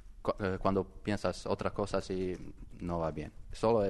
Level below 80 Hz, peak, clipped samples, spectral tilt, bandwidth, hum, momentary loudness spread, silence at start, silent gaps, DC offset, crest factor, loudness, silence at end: -50 dBFS; -14 dBFS; under 0.1%; -6.5 dB/octave; 12 kHz; none; 12 LU; 0.05 s; none; under 0.1%; 20 dB; -35 LUFS; 0 s